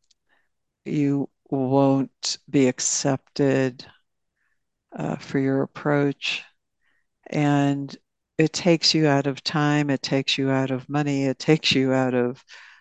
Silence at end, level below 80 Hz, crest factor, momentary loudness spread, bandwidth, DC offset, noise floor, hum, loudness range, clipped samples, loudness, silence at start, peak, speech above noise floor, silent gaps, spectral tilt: 0.2 s; -66 dBFS; 20 dB; 11 LU; 9.2 kHz; under 0.1%; -75 dBFS; none; 5 LU; under 0.1%; -23 LUFS; 0.85 s; -4 dBFS; 53 dB; none; -4.5 dB/octave